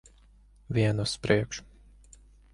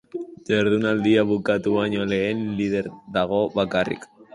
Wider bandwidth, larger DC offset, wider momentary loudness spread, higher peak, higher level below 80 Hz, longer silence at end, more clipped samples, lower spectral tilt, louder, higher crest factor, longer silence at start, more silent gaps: about the same, 11.5 kHz vs 11 kHz; neither; about the same, 10 LU vs 9 LU; about the same, -6 dBFS vs -6 dBFS; about the same, -52 dBFS vs -54 dBFS; first, 0.9 s vs 0.1 s; neither; about the same, -5.5 dB/octave vs -6.5 dB/octave; second, -28 LUFS vs -22 LUFS; first, 24 dB vs 16 dB; first, 0.7 s vs 0.15 s; neither